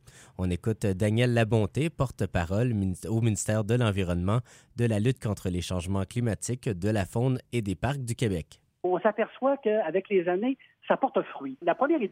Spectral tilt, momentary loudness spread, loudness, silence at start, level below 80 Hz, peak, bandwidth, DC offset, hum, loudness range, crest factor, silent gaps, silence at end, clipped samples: -6.5 dB/octave; 6 LU; -28 LUFS; 0.2 s; -50 dBFS; -10 dBFS; 15.5 kHz; under 0.1%; none; 3 LU; 18 dB; none; 0 s; under 0.1%